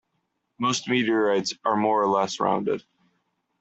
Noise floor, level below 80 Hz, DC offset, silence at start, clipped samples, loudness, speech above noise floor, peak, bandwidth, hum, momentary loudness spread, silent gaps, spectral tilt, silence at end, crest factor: -76 dBFS; -70 dBFS; under 0.1%; 0.6 s; under 0.1%; -24 LUFS; 52 dB; -8 dBFS; 8.2 kHz; none; 6 LU; none; -4 dB/octave; 0.8 s; 18 dB